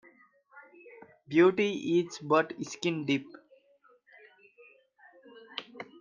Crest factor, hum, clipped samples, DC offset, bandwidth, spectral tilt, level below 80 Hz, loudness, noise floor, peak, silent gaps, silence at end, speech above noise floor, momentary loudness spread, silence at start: 22 dB; none; under 0.1%; under 0.1%; 7.4 kHz; -5.5 dB/octave; -80 dBFS; -29 LUFS; -65 dBFS; -12 dBFS; none; 0.2 s; 37 dB; 18 LU; 0.55 s